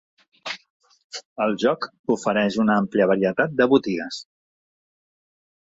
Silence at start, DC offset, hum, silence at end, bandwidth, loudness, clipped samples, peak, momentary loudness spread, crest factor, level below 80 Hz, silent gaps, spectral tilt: 0.45 s; under 0.1%; none; 1.55 s; 8 kHz; -21 LUFS; under 0.1%; -4 dBFS; 17 LU; 20 dB; -64 dBFS; 0.70-0.80 s, 1.04-1.10 s, 1.25-1.36 s, 1.99-2.04 s; -5.5 dB/octave